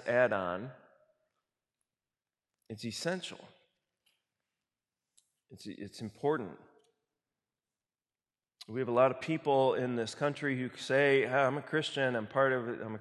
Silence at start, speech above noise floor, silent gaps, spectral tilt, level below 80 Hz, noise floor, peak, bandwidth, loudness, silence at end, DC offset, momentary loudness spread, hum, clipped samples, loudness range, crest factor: 0 s; over 58 dB; none; -5.5 dB/octave; -76 dBFS; under -90 dBFS; -14 dBFS; 12.5 kHz; -32 LUFS; 0 s; under 0.1%; 17 LU; none; under 0.1%; 14 LU; 20 dB